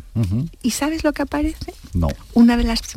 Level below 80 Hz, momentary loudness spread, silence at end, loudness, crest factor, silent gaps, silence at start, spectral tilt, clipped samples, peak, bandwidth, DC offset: -30 dBFS; 10 LU; 0 s; -20 LUFS; 14 dB; none; 0 s; -5.5 dB/octave; under 0.1%; -6 dBFS; 16 kHz; under 0.1%